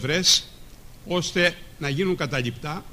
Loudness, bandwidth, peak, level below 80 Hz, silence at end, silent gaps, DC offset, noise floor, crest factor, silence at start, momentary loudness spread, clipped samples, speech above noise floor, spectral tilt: -23 LUFS; 15.5 kHz; -6 dBFS; -46 dBFS; 0 s; none; under 0.1%; -43 dBFS; 18 dB; 0 s; 13 LU; under 0.1%; 19 dB; -3 dB/octave